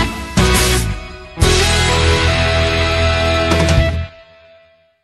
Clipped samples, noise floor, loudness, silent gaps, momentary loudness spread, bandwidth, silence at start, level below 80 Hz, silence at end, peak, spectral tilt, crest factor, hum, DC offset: under 0.1%; -50 dBFS; -14 LUFS; none; 11 LU; 12.5 kHz; 0 s; -22 dBFS; 0.95 s; 0 dBFS; -4 dB/octave; 14 dB; none; under 0.1%